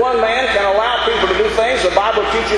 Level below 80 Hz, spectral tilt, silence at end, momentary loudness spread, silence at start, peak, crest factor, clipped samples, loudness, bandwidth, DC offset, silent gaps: -36 dBFS; -3 dB/octave; 0 s; 1 LU; 0 s; 0 dBFS; 14 dB; under 0.1%; -14 LUFS; 11 kHz; under 0.1%; none